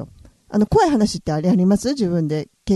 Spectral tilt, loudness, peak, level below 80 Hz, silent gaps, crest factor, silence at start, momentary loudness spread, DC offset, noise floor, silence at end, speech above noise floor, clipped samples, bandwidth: -6.5 dB/octave; -19 LUFS; -4 dBFS; -40 dBFS; none; 14 dB; 0 s; 9 LU; under 0.1%; -42 dBFS; 0 s; 25 dB; under 0.1%; 12.5 kHz